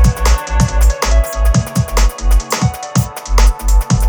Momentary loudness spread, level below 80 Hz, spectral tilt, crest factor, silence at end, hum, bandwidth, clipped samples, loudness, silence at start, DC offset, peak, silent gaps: 4 LU; -12 dBFS; -5 dB/octave; 12 dB; 0 s; none; over 20 kHz; under 0.1%; -15 LUFS; 0 s; under 0.1%; 0 dBFS; none